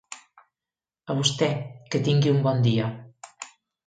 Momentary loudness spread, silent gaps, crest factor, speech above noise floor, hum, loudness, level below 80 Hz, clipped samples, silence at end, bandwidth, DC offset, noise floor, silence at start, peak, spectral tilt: 21 LU; none; 18 dB; over 67 dB; none; -24 LUFS; -64 dBFS; under 0.1%; 0.4 s; 9.4 kHz; under 0.1%; under -90 dBFS; 0.1 s; -8 dBFS; -5.5 dB/octave